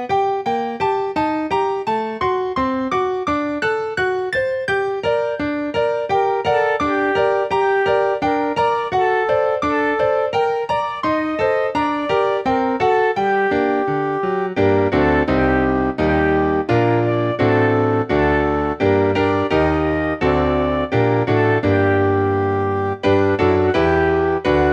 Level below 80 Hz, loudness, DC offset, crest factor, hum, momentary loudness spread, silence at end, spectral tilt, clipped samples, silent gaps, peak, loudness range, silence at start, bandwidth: -38 dBFS; -18 LUFS; under 0.1%; 14 dB; none; 4 LU; 0 s; -7.5 dB/octave; under 0.1%; none; -4 dBFS; 3 LU; 0 s; 8.4 kHz